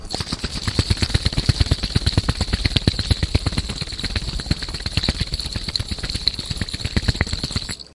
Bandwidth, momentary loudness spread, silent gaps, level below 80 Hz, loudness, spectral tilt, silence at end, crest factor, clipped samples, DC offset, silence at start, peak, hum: 11.5 kHz; 6 LU; none; -28 dBFS; -22 LUFS; -4.5 dB/octave; 0.1 s; 22 dB; under 0.1%; under 0.1%; 0 s; 0 dBFS; none